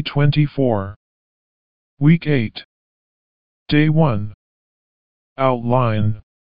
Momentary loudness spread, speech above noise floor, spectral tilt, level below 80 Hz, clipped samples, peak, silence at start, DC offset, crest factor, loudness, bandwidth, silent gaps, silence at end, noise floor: 13 LU; over 73 dB; -6.5 dB/octave; -48 dBFS; under 0.1%; -2 dBFS; 0 s; 3%; 18 dB; -18 LUFS; 5.2 kHz; 0.96-1.97 s, 2.65-3.66 s, 4.34-5.36 s; 0.3 s; under -90 dBFS